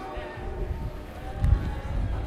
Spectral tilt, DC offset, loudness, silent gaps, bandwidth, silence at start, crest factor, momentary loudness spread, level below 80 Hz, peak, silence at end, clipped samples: -8 dB/octave; under 0.1%; -31 LUFS; none; 13 kHz; 0 s; 20 dB; 11 LU; -30 dBFS; -10 dBFS; 0 s; under 0.1%